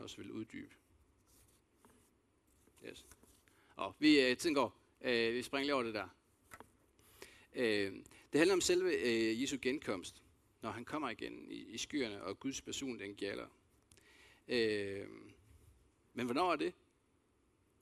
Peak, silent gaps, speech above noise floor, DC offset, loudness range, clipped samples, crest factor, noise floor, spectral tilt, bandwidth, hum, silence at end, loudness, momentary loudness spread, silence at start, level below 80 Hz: -14 dBFS; none; 38 dB; under 0.1%; 8 LU; under 0.1%; 24 dB; -75 dBFS; -3.5 dB/octave; 14 kHz; none; 1.1 s; -37 LUFS; 22 LU; 0 s; -72 dBFS